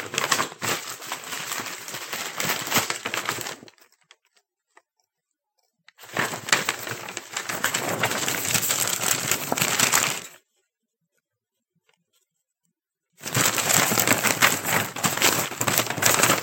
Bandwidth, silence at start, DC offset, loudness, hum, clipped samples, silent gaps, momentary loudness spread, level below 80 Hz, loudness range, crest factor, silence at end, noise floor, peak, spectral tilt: 17 kHz; 0 s; under 0.1%; -23 LUFS; none; under 0.1%; none; 13 LU; -72 dBFS; 9 LU; 26 dB; 0 s; -83 dBFS; 0 dBFS; -1.5 dB/octave